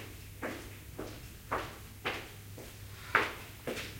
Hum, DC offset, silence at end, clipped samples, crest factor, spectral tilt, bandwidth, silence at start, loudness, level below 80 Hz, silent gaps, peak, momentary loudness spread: none; under 0.1%; 0 s; under 0.1%; 28 dB; -4 dB/octave; 16.5 kHz; 0 s; -39 LUFS; -56 dBFS; none; -10 dBFS; 17 LU